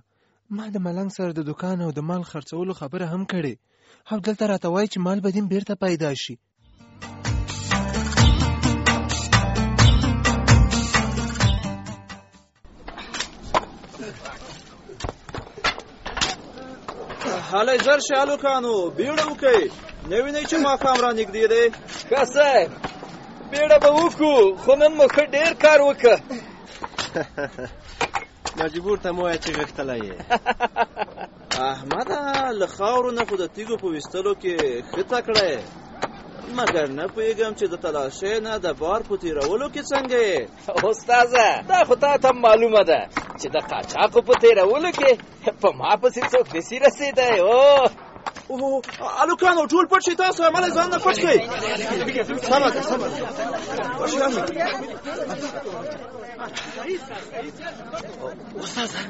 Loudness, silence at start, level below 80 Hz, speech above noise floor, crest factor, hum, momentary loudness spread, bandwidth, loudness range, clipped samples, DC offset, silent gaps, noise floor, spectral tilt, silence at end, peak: -21 LUFS; 0.5 s; -36 dBFS; 44 dB; 18 dB; none; 18 LU; 8 kHz; 11 LU; under 0.1%; under 0.1%; none; -64 dBFS; -4 dB/octave; 0 s; -2 dBFS